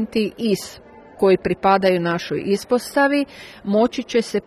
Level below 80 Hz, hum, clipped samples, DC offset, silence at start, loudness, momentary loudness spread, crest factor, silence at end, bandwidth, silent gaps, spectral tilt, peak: -54 dBFS; none; under 0.1%; under 0.1%; 0 s; -20 LUFS; 7 LU; 16 dB; 0.05 s; 13 kHz; none; -5.5 dB/octave; -4 dBFS